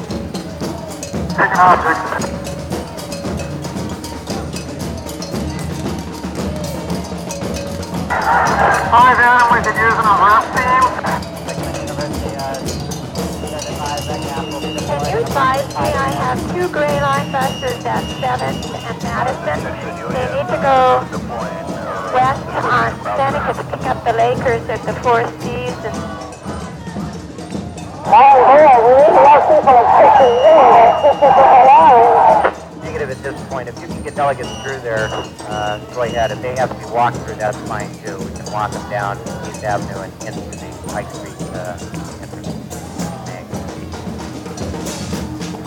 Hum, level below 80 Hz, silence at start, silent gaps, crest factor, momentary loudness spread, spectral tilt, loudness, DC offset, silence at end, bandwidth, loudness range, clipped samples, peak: none; -38 dBFS; 0 s; none; 16 dB; 19 LU; -5 dB/octave; -15 LUFS; under 0.1%; 0 s; 17.5 kHz; 16 LU; under 0.1%; 0 dBFS